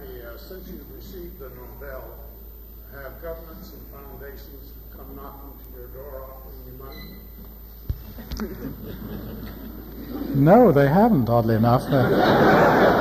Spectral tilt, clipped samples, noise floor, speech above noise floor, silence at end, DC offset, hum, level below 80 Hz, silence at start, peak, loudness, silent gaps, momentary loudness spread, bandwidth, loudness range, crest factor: -8 dB/octave; under 0.1%; -41 dBFS; 19 dB; 0 s; under 0.1%; none; -40 dBFS; 0 s; -6 dBFS; -18 LUFS; none; 26 LU; 15 kHz; 21 LU; 18 dB